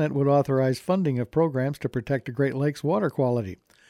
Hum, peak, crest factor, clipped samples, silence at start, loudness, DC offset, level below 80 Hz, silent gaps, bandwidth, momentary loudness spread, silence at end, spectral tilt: none; -10 dBFS; 14 dB; under 0.1%; 0 s; -25 LUFS; under 0.1%; -58 dBFS; none; 13.5 kHz; 7 LU; 0.35 s; -8 dB/octave